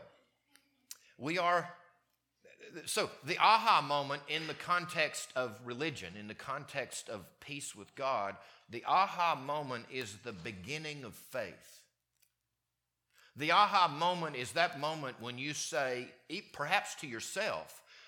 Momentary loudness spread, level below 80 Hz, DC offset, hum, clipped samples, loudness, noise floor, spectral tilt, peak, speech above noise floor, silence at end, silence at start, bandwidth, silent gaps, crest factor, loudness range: 17 LU; -80 dBFS; under 0.1%; none; under 0.1%; -34 LUFS; -87 dBFS; -3 dB/octave; -12 dBFS; 52 dB; 0 s; 0 s; 19 kHz; none; 24 dB; 8 LU